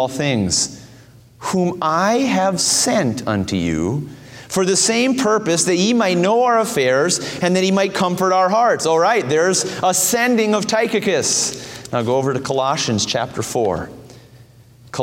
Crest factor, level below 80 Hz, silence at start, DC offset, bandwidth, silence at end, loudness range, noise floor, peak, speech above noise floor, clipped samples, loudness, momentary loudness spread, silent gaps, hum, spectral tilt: 16 dB; -50 dBFS; 0 s; under 0.1%; 16.5 kHz; 0 s; 3 LU; -46 dBFS; -2 dBFS; 28 dB; under 0.1%; -17 LUFS; 8 LU; none; none; -3.5 dB/octave